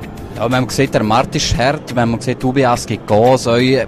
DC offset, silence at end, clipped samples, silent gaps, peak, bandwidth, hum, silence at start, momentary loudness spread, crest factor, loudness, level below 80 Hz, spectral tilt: under 0.1%; 0 s; under 0.1%; none; -2 dBFS; 14.5 kHz; none; 0 s; 6 LU; 12 dB; -15 LUFS; -34 dBFS; -5 dB/octave